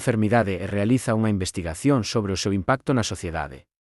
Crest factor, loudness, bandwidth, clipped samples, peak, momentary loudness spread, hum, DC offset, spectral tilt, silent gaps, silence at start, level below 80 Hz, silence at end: 16 dB; -23 LUFS; 12 kHz; under 0.1%; -6 dBFS; 8 LU; none; under 0.1%; -5.5 dB/octave; none; 0 s; -48 dBFS; 0.4 s